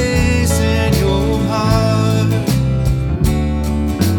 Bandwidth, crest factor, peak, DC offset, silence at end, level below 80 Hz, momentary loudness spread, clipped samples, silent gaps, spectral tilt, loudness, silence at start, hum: 19 kHz; 14 dB; 0 dBFS; under 0.1%; 0 s; -22 dBFS; 3 LU; under 0.1%; none; -6 dB/octave; -15 LUFS; 0 s; none